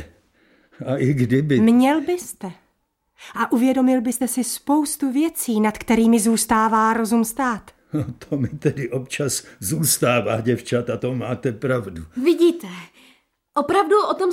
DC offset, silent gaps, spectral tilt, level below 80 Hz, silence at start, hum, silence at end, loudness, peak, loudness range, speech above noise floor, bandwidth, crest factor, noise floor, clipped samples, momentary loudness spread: under 0.1%; none; -5 dB/octave; -52 dBFS; 0 s; none; 0 s; -20 LUFS; -6 dBFS; 3 LU; 50 dB; 16.5 kHz; 16 dB; -70 dBFS; under 0.1%; 11 LU